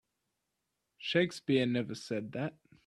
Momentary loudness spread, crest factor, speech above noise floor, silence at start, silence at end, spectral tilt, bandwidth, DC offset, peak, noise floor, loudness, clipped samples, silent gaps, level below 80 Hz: 10 LU; 22 dB; 52 dB; 1 s; 0.35 s; -6 dB/octave; 12.5 kHz; under 0.1%; -14 dBFS; -85 dBFS; -34 LUFS; under 0.1%; none; -74 dBFS